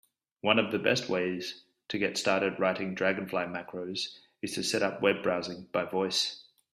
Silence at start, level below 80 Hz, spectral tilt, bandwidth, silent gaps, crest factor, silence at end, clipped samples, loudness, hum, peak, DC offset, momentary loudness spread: 0.45 s; -72 dBFS; -3.5 dB/octave; 14 kHz; none; 24 dB; 0.3 s; under 0.1%; -30 LUFS; none; -8 dBFS; under 0.1%; 10 LU